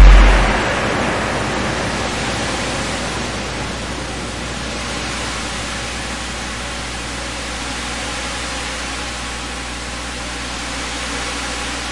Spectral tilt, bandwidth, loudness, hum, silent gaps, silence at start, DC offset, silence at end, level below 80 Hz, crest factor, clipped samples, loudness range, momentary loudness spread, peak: -3.5 dB/octave; 11.5 kHz; -21 LUFS; 60 Hz at -30 dBFS; none; 0 s; 0.7%; 0 s; -20 dBFS; 18 dB; under 0.1%; 4 LU; 7 LU; 0 dBFS